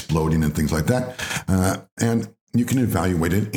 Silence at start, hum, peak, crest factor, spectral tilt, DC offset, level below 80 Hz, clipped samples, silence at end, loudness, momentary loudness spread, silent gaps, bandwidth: 0 s; none; -6 dBFS; 16 dB; -6 dB/octave; under 0.1%; -40 dBFS; under 0.1%; 0 s; -22 LUFS; 5 LU; 1.92-1.97 s, 2.41-2.47 s; over 20 kHz